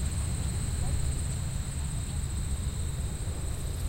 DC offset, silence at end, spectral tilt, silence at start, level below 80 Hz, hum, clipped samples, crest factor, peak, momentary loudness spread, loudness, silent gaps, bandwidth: under 0.1%; 0 s; -4.5 dB/octave; 0 s; -34 dBFS; none; under 0.1%; 14 dB; -18 dBFS; 3 LU; -33 LUFS; none; 16 kHz